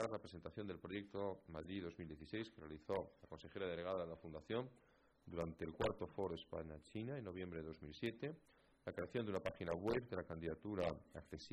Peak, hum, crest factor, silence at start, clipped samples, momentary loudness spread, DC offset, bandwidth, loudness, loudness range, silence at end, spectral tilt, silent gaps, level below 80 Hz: -26 dBFS; none; 20 dB; 0 s; under 0.1%; 11 LU; under 0.1%; 11 kHz; -48 LUFS; 3 LU; 0 s; -7 dB/octave; none; -68 dBFS